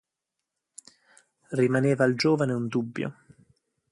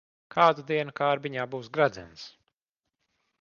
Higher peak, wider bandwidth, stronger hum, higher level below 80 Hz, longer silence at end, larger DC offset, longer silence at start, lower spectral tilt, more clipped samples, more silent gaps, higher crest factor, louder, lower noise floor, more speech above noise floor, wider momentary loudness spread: about the same, -8 dBFS vs -6 dBFS; first, 11.5 kHz vs 7.2 kHz; neither; about the same, -68 dBFS vs -68 dBFS; second, 0.8 s vs 1.15 s; neither; first, 1.5 s vs 0.35 s; about the same, -6.5 dB/octave vs -6 dB/octave; neither; neither; about the same, 20 dB vs 22 dB; about the same, -26 LUFS vs -27 LUFS; about the same, -85 dBFS vs -86 dBFS; about the same, 61 dB vs 59 dB; second, 11 LU vs 21 LU